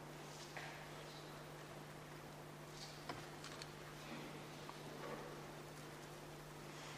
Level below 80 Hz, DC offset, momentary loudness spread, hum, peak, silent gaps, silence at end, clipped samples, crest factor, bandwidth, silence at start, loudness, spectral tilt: -72 dBFS; under 0.1%; 4 LU; none; -32 dBFS; none; 0 s; under 0.1%; 22 dB; 15.5 kHz; 0 s; -53 LUFS; -4 dB/octave